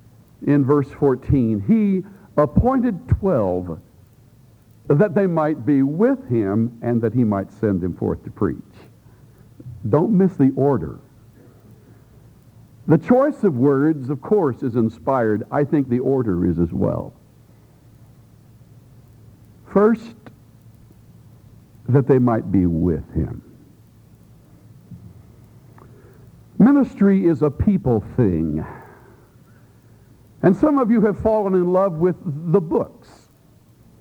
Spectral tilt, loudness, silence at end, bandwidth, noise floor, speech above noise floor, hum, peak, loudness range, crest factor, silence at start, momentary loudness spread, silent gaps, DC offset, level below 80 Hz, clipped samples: -11 dB/octave; -19 LUFS; 1.15 s; 8 kHz; -52 dBFS; 34 dB; none; -2 dBFS; 7 LU; 18 dB; 0.4 s; 10 LU; none; under 0.1%; -42 dBFS; under 0.1%